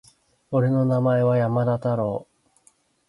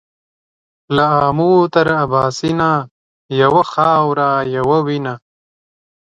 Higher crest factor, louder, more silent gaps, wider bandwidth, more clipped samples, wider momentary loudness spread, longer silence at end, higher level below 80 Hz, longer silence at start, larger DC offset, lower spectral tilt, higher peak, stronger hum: about the same, 14 dB vs 16 dB; second, -22 LUFS vs -14 LUFS; second, none vs 2.91-3.29 s; first, 11 kHz vs 9.4 kHz; neither; about the same, 7 LU vs 9 LU; about the same, 0.85 s vs 0.95 s; second, -62 dBFS vs -50 dBFS; second, 0.5 s vs 0.9 s; neither; first, -10 dB/octave vs -6.5 dB/octave; second, -10 dBFS vs 0 dBFS; neither